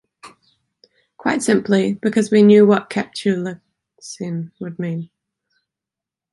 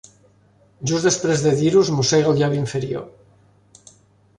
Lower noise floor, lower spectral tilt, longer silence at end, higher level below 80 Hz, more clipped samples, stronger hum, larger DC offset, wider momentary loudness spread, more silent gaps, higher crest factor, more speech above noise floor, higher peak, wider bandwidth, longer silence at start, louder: first, -87 dBFS vs -56 dBFS; about the same, -6 dB/octave vs -5 dB/octave; about the same, 1.3 s vs 1.3 s; second, -64 dBFS vs -54 dBFS; neither; neither; neither; first, 19 LU vs 11 LU; neither; about the same, 18 dB vs 16 dB; first, 70 dB vs 37 dB; about the same, -2 dBFS vs -4 dBFS; about the same, 11.5 kHz vs 11 kHz; second, 0.25 s vs 0.8 s; about the same, -17 LUFS vs -19 LUFS